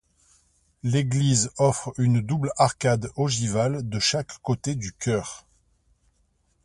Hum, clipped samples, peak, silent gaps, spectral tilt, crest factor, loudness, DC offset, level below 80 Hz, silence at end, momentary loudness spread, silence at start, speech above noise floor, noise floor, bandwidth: none; under 0.1%; -4 dBFS; none; -5 dB/octave; 22 dB; -24 LUFS; under 0.1%; -52 dBFS; 1.25 s; 8 LU; 0.85 s; 44 dB; -68 dBFS; 11.5 kHz